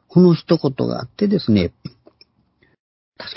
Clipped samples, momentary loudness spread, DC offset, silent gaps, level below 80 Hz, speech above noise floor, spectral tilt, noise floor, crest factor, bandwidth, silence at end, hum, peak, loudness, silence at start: under 0.1%; 22 LU; under 0.1%; 2.79-3.12 s; -46 dBFS; 44 dB; -11.5 dB/octave; -60 dBFS; 18 dB; 5.8 kHz; 0.05 s; none; 0 dBFS; -18 LUFS; 0.15 s